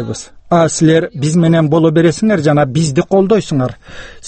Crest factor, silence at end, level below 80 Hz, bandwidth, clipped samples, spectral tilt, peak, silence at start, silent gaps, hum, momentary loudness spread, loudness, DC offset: 12 dB; 0 s; -42 dBFS; 8.8 kHz; under 0.1%; -6.5 dB/octave; 0 dBFS; 0 s; none; none; 8 LU; -12 LUFS; under 0.1%